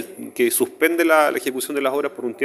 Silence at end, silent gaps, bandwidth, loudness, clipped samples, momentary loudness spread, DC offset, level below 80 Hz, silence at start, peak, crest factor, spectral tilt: 0 s; none; 15.5 kHz; -19 LUFS; under 0.1%; 8 LU; under 0.1%; -74 dBFS; 0 s; -2 dBFS; 18 dB; -2.5 dB/octave